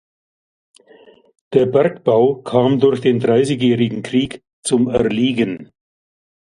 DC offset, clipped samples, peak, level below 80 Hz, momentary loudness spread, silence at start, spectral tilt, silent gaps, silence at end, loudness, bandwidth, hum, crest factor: under 0.1%; under 0.1%; 0 dBFS; -52 dBFS; 6 LU; 1.5 s; -6 dB/octave; 4.53-4.63 s; 0.95 s; -16 LUFS; 11.5 kHz; none; 18 dB